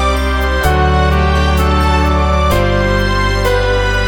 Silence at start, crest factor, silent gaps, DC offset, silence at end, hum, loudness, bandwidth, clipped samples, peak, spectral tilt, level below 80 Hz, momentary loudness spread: 0 s; 12 dB; none; under 0.1%; 0 s; none; -13 LUFS; 18.5 kHz; under 0.1%; 0 dBFS; -6 dB/octave; -16 dBFS; 2 LU